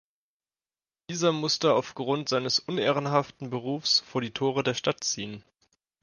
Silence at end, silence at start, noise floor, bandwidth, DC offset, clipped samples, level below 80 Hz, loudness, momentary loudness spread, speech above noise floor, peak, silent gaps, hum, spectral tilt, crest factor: 0.6 s; 1.1 s; under -90 dBFS; 10.5 kHz; under 0.1%; under 0.1%; -70 dBFS; -27 LUFS; 10 LU; over 63 dB; -8 dBFS; none; none; -4 dB/octave; 20 dB